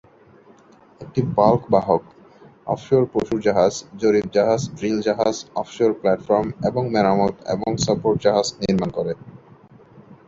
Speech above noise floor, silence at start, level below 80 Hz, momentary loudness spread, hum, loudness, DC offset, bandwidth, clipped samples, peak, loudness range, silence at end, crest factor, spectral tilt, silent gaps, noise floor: 30 dB; 1 s; -52 dBFS; 9 LU; none; -20 LUFS; under 0.1%; 7.8 kHz; under 0.1%; -2 dBFS; 2 LU; 0.15 s; 20 dB; -6 dB/octave; none; -50 dBFS